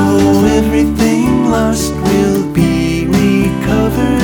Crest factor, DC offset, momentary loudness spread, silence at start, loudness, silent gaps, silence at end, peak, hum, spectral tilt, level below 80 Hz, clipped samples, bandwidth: 10 dB; under 0.1%; 4 LU; 0 s; -12 LUFS; none; 0 s; 0 dBFS; none; -6 dB/octave; -26 dBFS; under 0.1%; over 20 kHz